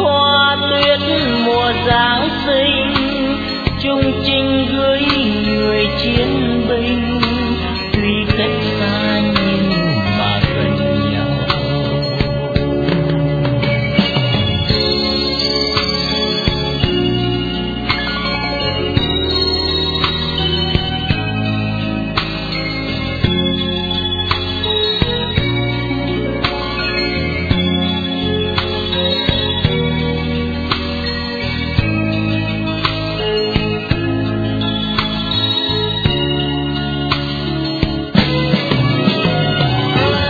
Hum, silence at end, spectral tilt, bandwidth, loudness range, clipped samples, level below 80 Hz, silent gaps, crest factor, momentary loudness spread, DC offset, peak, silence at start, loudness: none; 0 s; -7 dB/octave; 5 kHz; 3 LU; under 0.1%; -30 dBFS; none; 16 dB; 5 LU; under 0.1%; 0 dBFS; 0 s; -16 LUFS